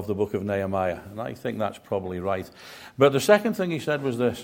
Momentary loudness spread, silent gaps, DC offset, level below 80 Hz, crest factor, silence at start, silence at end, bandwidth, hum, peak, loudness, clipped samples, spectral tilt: 13 LU; none; under 0.1%; -60 dBFS; 22 dB; 0 s; 0 s; 16.5 kHz; none; -4 dBFS; -25 LUFS; under 0.1%; -5.5 dB/octave